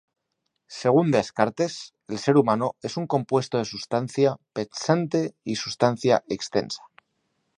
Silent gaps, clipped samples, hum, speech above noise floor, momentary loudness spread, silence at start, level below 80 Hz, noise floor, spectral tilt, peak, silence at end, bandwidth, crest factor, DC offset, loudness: none; under 0.1%; none; 54 dB; 12 LU; 0.7 s; -64 dBFS; -78 dBFS; -5.5 dB/octave; -2 dBFS; 0.8 s; 11 kHz; 22 dB; under 0.1%; -24 LUFS